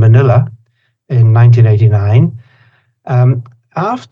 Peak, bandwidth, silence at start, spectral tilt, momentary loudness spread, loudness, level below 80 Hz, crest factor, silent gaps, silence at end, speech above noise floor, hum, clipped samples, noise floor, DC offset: 0 dBFS; 5.2 kHz; 0 s; -10 dB/octave; 12 LU; -10 LUFS; -46 dBFS; 10 dB; none; 0.1 s; 47 dB; none; under 0.1%; -55 dBFS; under 0.1%